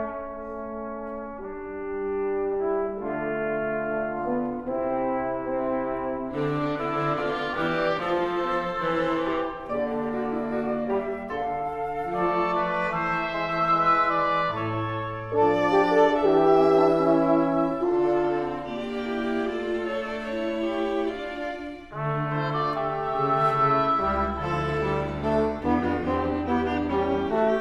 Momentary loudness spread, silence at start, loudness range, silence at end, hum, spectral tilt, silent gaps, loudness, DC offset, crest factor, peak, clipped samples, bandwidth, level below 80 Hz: 11 LU; 0 s; 7 LU; 0 s; none; -7.5 dB/octave; none; -25 LUFS; under 0.1%; 18 dB; -8 dBFS; under 0.1%; 9.8 kHz; -48 dBFS